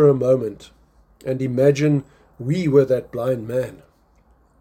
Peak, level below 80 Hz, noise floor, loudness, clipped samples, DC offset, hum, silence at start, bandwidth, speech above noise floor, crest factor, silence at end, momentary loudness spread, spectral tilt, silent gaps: -4 dBFS; -54 dBFS; -57 dBFS; -20 LUFS; under 0.1%; under 0.1%; none; 0 s; 16 kHz; 38 dB; 16 dB; 0.85 s; 14 LU; -8 dB/octave; none